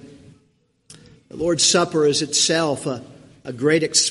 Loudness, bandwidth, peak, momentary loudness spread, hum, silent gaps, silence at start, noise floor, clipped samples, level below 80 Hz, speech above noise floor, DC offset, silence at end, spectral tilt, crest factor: -18 LUFS; 11.5 kHz; -2 dBFS; 18 LU; none; none; 0.05 s; -63 dBFS; under 0.1%; -58 dBFS; 44 dB; under 0.1%; 0 s; -2.5 dB/octave; 20 dB